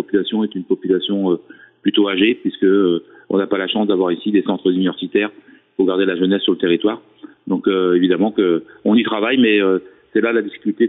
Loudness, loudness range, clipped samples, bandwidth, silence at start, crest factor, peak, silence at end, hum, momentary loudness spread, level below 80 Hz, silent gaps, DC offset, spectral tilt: -17 LUFS; 2 LU; under 0.1%; 4 kHz; 0 s; 14 dB; -4 dBFS; 0 s; none; 7 LU; -64 dBFS; none; under 0.1%; -9.5 dB/octave